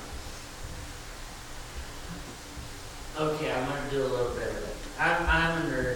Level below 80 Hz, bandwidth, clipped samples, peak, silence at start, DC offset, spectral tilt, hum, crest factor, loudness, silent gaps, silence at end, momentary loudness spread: -42 dBFS; 19 kHz; under 0.1%; -12 dBFS; 0 s; under 0.1%; -4.5 dB/octave; none; 18 dB; -31 LUFS; none; 0 s; 17 LU